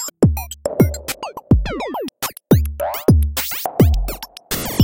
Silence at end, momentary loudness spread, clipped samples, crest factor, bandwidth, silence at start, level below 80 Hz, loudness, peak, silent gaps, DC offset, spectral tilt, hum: 0 s; 11 LU; under 0.1%; 16 dB; 17 kHz; 0 s; -24 dBFS; -19 LUFS; -2 dBFS; none; under 0.1%; -6 dB/octave; none